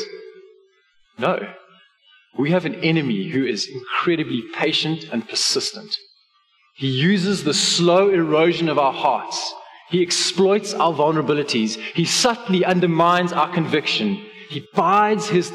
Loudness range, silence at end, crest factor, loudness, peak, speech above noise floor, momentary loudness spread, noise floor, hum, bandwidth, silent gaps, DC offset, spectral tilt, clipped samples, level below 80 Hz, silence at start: 4 LU; 0 s; 14 dB; -19 LUFS; -6 dBFS; 42 dB; 10 LU; -61 dBFS; none; 13.5 kHz; none; under 0.1%; -4 dB/octave; under 0.1%; -66 dBFS; 0 s